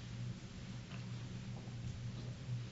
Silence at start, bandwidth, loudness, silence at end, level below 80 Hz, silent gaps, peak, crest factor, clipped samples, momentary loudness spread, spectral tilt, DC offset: 0 s; 7.6 kHz; -47 LUFS; 0 s; -60 dBFS; none; -32 dBFS; 14 dB; under 0.1%; 4 LU; -6.5 dB/octave; under 0.1%